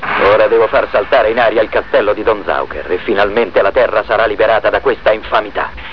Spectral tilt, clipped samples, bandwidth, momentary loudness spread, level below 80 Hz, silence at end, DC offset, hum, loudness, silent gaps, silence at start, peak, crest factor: -6.5 dB/octave; under 0.1%; 5.4 kHz; 7 LU; -38 dBFS; 0 s; 2%; none; -13 LUFS; none; 0 s; 0 dBFS; 12 dB